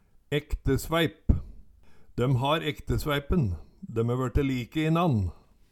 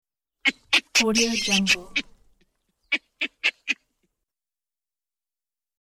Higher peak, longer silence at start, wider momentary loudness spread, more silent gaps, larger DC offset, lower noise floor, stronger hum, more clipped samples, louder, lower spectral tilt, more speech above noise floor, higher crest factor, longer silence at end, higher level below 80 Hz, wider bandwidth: about the same, -6 dBFS vs -6 dBFS; second, 0.3 s vs 0.45 s; second, 7 LU vs 10 LU; neither; neither; second, -52 dBFS vs under -90 dBFS; neither; neither; second, -28 LUFS vs -23 LUFS; first, -6.5 dB/octave vs -1.5 dB/octave; second, 25 dB vs over 67 dB; about the same, 20 dB vs 22 dB; second, 0.4 s vs 2.1 s; first, -36 dBFS vs -56 dBFS; about the same, 18 kHz vs 16.5 kHz